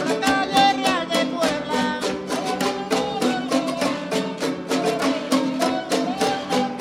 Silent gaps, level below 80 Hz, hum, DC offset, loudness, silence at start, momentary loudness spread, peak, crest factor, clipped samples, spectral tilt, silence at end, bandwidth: none; -56 dBFS; none; under 0.1%; -22 LUFS; 0 s; 7 LU; -4 dBFS; 18 dB; under 0.1%; -3.5 dB/octave; 0 s; 16.5 kHz